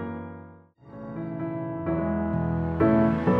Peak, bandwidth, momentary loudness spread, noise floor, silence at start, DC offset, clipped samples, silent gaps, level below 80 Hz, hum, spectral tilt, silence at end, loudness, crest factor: -10 dBFS; 5 kHz; 20 LU; -49 dBFS; 0 s; under 0.1%; under 0.1%; none; -44 dBFS; none; -11 dB/octave; 0 s; -26 LUFS; 16 dB